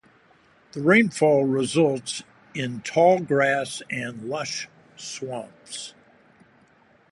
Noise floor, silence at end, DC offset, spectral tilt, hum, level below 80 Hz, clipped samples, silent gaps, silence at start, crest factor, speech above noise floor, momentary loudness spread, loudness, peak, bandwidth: -58 dBFS; 1.2 s; under 0.1%; -5 dB/octave; none; -68 dBFS; under 0.1%; none; 0.75 s; 20 dB; 35 dB; 18 LU; -23 LUFS; -6 dBFS; 11.5 kHz